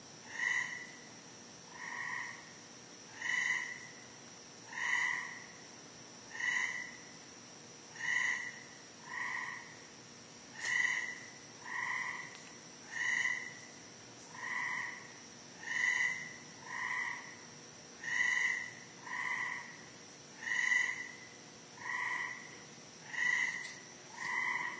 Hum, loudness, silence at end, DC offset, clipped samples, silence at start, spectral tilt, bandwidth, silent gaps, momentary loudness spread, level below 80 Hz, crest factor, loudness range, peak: none; -36 LUFS; 0 s; under 0.1%; under 0.1%; 0 s; -0.5 dB/octave; 8 kHz; none; 19 LU; -82 dBFS; 20 dB; 4 LU; -20 dBFS